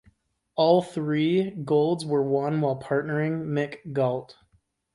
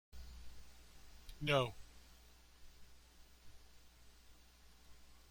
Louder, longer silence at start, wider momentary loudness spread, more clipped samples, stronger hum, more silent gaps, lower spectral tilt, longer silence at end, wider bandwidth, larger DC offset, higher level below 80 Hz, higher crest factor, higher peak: first, -25 LUFS vs -38 LUFS; first, 0.55 s vs 0.1 s; second, 8 LU vs 29 LU; neither; neither; neither; first, -7.5 dB/octave vs -5 dB/octave; first, 0.6 s vs 0 s; second, 11.5 kHz vs 16.5 kHz; neither; about the same, -66 dBFS vs -62 dBFS; second, 18 dB vs 26 dB; first, -8 dBFS vs -22 dBFS